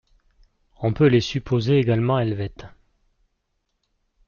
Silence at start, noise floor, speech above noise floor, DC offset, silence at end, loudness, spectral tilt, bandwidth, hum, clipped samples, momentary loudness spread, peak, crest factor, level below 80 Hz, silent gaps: 0.8 s; -74 dBFS; 54 dB; under 0.1%; 1.6 s; -21 LUFS; -7.5 dB/octave; 7 kHz; none; under 0.1%; 10 LU; -6 dBFS; 18 dB; -50 dBFS; none